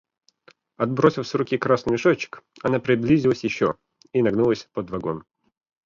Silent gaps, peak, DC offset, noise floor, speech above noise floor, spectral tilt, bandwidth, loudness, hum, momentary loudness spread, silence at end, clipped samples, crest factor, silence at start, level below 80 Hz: none; -2 dBFS; under 0.1%; -57 dBFS; 36 dB; -7 dB/octave; 7.4 kHz; -22 LUFS; none; 10 LU; 0.65 s; under 0.1%; 20 dB; 0.8 s; -54 dBFS